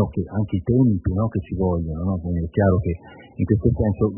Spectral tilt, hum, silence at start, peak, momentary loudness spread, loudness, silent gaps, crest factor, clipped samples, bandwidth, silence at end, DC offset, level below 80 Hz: -14 dB/octave; none; 0 s; -4 dBFS; 8 LU; -22 LUFS; none; 18 dB; under 0.1%; 3.1 kHz; 0 s; under 0.1%; -38 dBFS